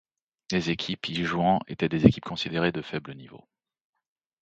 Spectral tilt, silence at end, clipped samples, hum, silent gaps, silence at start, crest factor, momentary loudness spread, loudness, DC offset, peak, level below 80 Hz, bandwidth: -6.5 dB/octave; 1.05 s; under 0.1%; none; none; 0.5 s; 26 dB; 14 LU; -26 LUFS; under 0.1%; -2 dBFS; -52 dBFS; 8.2 kHz